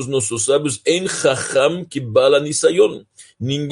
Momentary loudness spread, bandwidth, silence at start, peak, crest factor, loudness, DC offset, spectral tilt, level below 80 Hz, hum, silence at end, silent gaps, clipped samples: 9 LU; 11.5 kHz; 0 s; -2 dBFS; 16 dB; -17 LUFS; under 0.1%; -3.5 dB/octave; -60 dBFS; none; 0 s; none; under 0.1%